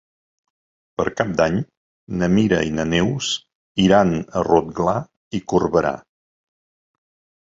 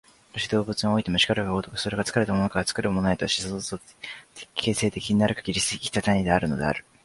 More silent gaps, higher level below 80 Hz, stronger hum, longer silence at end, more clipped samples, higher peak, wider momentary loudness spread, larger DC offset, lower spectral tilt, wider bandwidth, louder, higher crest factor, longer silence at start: first, 1.77-2.07 s, 3.55-3.75 s, 5.17-5.31 s vs none; about the same, -46 dBFS vs -48 dBFS; neither; first, 1.4 s vs 0.25 s; neither; first, -2 dBFS vs -6 dBFS; about the same, 13 LU vs 11 LU; neither; about the same, -5.5 dB/octave vs -4.5 dB/octave; second, 7.8 kHz vs 11.5 kHz; first, -20 LUFS vs -25 LUFS; about the same, 20 dB vs 20 dB; first, 1 s vs 0.35 s